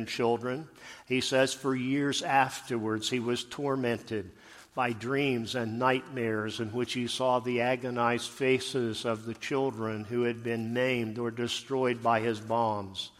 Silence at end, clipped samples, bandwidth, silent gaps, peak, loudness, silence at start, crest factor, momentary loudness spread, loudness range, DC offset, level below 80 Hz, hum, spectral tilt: 0.1 s; under 0.1%; 15 kHz; none; -10 dBFS; -30 LUFS; 0 s; 20 dB; 7 LU; 2 LU; under 0.1%; -68 dBFS; none; -4.5 dB/octave